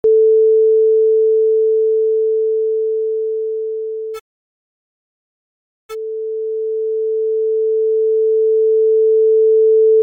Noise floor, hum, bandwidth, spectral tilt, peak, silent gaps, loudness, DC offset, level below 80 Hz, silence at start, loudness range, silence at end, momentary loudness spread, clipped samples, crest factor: under -90 dBFS; none; 2.3 kHz; -5.5 dB/octave; -6 dBFS; 4.21-5.89 s; -15 LUFS; under 0.1%; -70 dBFS; 0.05 s; 12 LU; 0 s; 12 LU; under 0.1%; 8 dB